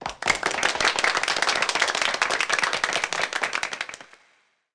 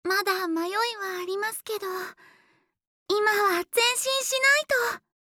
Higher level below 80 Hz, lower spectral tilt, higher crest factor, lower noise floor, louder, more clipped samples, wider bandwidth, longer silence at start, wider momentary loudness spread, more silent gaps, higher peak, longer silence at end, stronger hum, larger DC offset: first, -58 dBFS vs -74 dBFS; about the same, 0 dB/octave vs 0 dB/octave; about the same, 18 dB vs 18 dB; about the same, -64 dBFS vs -66 dBFS; about the same, -23 LUFS vs -25 LUFS; neither; second, 10.5 kHz vs over 20 kHz; about the same, 0 s vs 0.05 s; second, 7 LU vs 11 LU; second, none vs 2.87-3.06 s; about the same, -8 dBFS vs -8 dBFS; first, 0.7 s vs 0.25 s; neither; neither